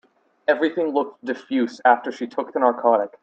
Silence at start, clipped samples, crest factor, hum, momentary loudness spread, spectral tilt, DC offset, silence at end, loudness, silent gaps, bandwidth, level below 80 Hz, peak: 0.5 s; under 0.1%; 18 dB; none; 10 LU; -5 dB/octave; under 0.1%; 0.15 s; -22 LUFS; none; 8 kHz; -76 dBFS; -2 dBFS